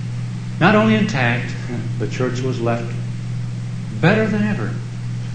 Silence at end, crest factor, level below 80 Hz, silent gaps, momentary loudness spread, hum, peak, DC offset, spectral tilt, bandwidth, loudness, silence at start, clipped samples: 0 s; 18 dB; -44 dBFS; none; 12 LU; none; -2 dBFS; under 0.1%; -7 dB/octave; 9.2 kHz; -20 LUFS; 0 s; under 0.1%